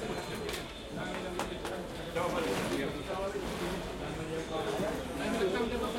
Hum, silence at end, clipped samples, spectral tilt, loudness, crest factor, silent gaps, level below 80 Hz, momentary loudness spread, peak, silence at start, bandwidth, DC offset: none; 0 s; under 0.1%; -4.5 dB/octave; -36 LUFS; 18 dB; none; -50 dBFS; 7 LU; -16 dBFS; 0 s; 16.5 kHz; under 0.1%